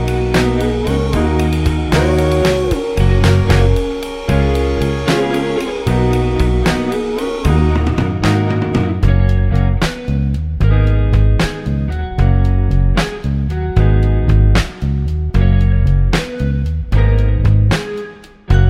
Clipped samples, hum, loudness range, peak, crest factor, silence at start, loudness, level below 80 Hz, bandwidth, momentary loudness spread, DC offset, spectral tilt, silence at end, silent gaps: under 0.1%; none; 1 LU; 0 dBFS; 12 dB; 0 s; -15 LUFS; -18 dBFS; 13.5 kHz; 6 LU; under 0.1%; -7 dB/octave; 0 s; none